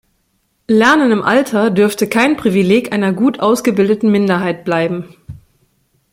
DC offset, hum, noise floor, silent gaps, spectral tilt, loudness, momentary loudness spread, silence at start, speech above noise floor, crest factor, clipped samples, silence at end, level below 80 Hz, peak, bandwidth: under 0.1%; none; -63 dBFS; none; -5.5 dB/octave; -13 LUFS; 6 LU; 0.7 s; 50 dB; 14 dB; under 0.1%; 0.8 s; -52 dBFS; 0 dBFS; 16.5 kHz